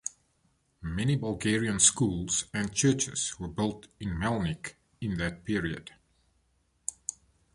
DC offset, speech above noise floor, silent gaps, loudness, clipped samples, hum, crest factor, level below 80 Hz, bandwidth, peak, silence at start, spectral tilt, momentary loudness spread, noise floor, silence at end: under 0.1%; 42 dB; none; -29 LUFS; under 0.1%; none; 24 dB; -50 dBFS; 11.5 kHz; -8 dBFS; 0.05 s; -3.5 dB/octave; 17 LU; -71 dBFS; 0.45 s